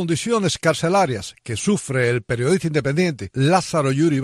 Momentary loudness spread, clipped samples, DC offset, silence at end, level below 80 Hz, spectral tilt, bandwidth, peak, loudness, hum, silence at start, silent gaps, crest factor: 4 LU; under 0.1%; under 0.1%; 0 s; -52 dBFS; -5.5 dB/octave; 12.5 kHz; -4 dBFS; -20 LUFS; none; 0 s; none; 16 dB